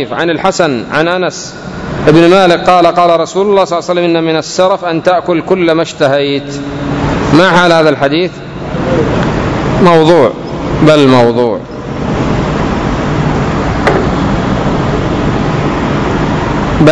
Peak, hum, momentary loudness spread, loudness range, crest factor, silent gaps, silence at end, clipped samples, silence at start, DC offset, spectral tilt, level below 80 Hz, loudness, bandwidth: 0 dBFS; none; 10 LU; 3 LU; 10 dB; none; 0 s; 2%; 0 s; under 0.1%; -6 dB/octave; -26 dBFS; -10 LUFS; 11 kHz